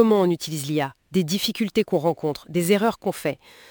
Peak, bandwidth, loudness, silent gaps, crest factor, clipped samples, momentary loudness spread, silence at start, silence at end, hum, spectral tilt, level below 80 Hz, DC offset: -4 dBFS; over 20 kHz; -23 LUFS; none; 18 dB; under 0.1%; 7 LU; 0 s; 0.35 s; none; -5.5 dB/octave; -60 dBFS; under 0.1%